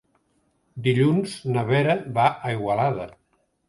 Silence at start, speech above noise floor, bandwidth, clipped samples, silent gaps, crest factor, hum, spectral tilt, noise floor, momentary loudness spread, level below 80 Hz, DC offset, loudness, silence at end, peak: 0.75 s; 46 dB; 11.5 kHz; under 0.1%; none; 18 dB; none; -7 dB/octave; -68 dBFS; 9 LU; -60 dBFS; under 0.1%; -23 LUFS; 0.6 s; -6 dBFS